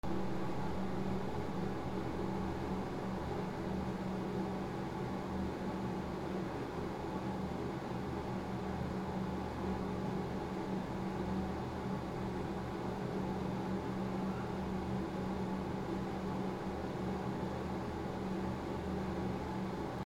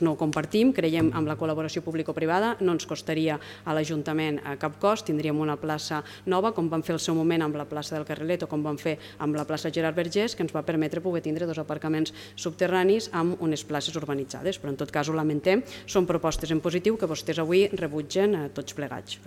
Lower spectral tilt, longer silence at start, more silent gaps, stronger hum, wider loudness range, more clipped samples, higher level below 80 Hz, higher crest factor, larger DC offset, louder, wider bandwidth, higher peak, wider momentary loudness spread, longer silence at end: first, -7.5 dB/octave vs -5.5 dB/octave; about the same, 0.05 s vs 0 s; neither; neither; about the same, 1 LU vs 3 LU; neither; about the same, -54 dBFS vs -54 dBFS; about the same, 14 dB vs 16 dB; neither; second, -40 LUFS vs -27 LUFS; about the same, 14.5 kHz vs 15.5 kHz; second, -24 dBFS vs -10 dBFS; second, 2 LU vs 8 LU; about the same, 0 s vs 0 s